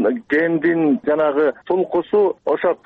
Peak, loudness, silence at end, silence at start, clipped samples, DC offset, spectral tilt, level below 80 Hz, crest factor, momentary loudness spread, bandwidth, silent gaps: -8 dBFS; -18 LUFS; 0.1 s; 0 s; under 0.1%; under 0.1%; -9 dB/octave; -62 dBFS; 10 dB; 3 LU; 4.5 kHz; none